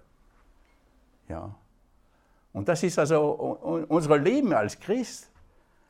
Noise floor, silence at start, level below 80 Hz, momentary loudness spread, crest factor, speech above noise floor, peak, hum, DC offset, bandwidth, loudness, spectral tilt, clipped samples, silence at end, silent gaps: -63 dBFS; 1.3 s; -60 dBFS; 18 LU; 22 dB; 38 dB; -6 dBFS; none; under 0.1%; 15 kHz; -26 LUFS; -6 dB/octave; under 0.1%; 0.65 s; none